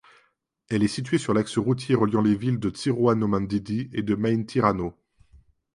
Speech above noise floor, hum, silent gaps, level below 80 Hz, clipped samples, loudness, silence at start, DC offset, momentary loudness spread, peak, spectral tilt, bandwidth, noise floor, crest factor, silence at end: 44 dB; none; none; -52 dBFS; under 0.1%; -24 LUFS; 0.7 s; under 0.1%; 6 LU; -4 dBFS; -7 dB/octave; 11 kHz; -68 dBFS; 20 dB; 0.85 s